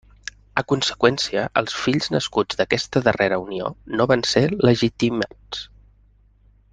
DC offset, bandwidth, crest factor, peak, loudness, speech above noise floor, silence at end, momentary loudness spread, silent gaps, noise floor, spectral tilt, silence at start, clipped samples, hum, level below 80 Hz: under 0.1%; 10 kHz; 20 dB; -2 dBFS; -21 LUFS; 35 dB; 1.05 s; 12 LU; none; -55 dBFS; -5 dB/octave; 0.55 s; under 0.1%; 50 Hz at -50 dBFS; -50 dBFS